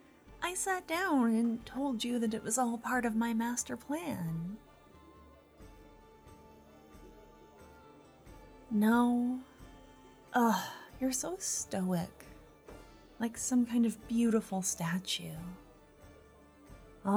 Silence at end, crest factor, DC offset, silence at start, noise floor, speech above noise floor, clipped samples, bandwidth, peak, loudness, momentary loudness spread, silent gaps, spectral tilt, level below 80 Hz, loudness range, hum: 0 s; 18 dB; under 0.1%; 0.25 s; -59 dBFS; 26 dB; under 0.1%; 20 kHz; -16 dBFS; -33 LUFS; 16 LU; none; -4 dB/octave; -62 dBFS; 7 LU; none